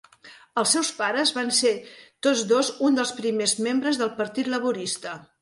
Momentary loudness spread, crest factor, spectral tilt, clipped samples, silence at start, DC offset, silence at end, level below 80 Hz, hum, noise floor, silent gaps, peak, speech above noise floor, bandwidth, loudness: 8 LU; 18 dB; -2 dB/octave; under 0.1%; 0.25 s; under 0.1%; 0.2 s; -72 dBFS; none; -50 dBFS; none; -6 dBFS; 26 dB; 12 kHz; -24 LUFS